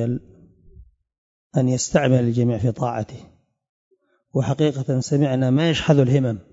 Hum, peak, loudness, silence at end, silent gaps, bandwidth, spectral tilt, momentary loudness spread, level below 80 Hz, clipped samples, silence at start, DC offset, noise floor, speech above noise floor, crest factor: none; -4 dBFS; -20 LUFS; 0.1 s; 1.18-1.50 s, 3.69-3.91 s; 8 kHz; -6.5 dB/octave; 9 LU; -50 dBFS; under 0.1%; 0 s; under 0.1%; -49 dBFS; 29 dB; 18 dB